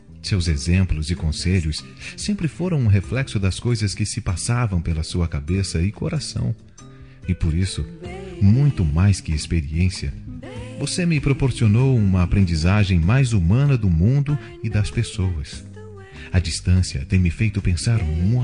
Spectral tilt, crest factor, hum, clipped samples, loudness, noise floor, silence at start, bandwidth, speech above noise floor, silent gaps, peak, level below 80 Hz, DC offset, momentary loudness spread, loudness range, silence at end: -6 dB/octave; 14 dB; none; under 0.1%; -21 LUFS; -43 dBFS; 0.1 s; 10 kHz; 23 dB; none; -6 dBFS; -34 dBFS; 0.3%; 13 LU; 6 LU; 0 s